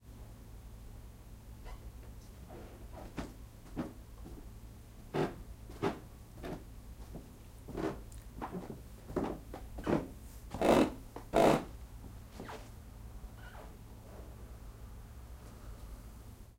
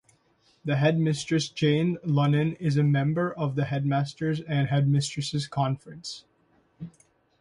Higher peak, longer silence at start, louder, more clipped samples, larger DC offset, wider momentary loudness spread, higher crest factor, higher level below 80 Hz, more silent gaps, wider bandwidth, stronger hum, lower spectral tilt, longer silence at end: second, -14 dBFS vs -10 dBFS; second, 0 s vs 0.65 s; second, -37 LUFS vs -26 LUFS; neither; neither; first, 19 LU vs 15 LU; first, 26 dB vs 16 dB; first, -50 dBFS vs -62 dBFS; neither; first, 16 kHz vs 11 kHz; neither; about the same, -6 dB/octave vs -6.5 dB/octave; second, 0 s vs 0.5 s